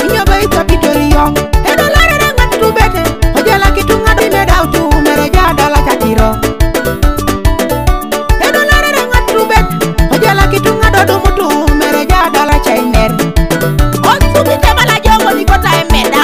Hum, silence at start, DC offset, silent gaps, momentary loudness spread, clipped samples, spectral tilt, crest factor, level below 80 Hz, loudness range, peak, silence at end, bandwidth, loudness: none; 0 s; 2%; none; 5 LU; 1%; -5 dB/octave; 8 dB; -14 dBFS; 2 LU; 0 dBFS; 0 s; 16.5 kHz; -9 LUFS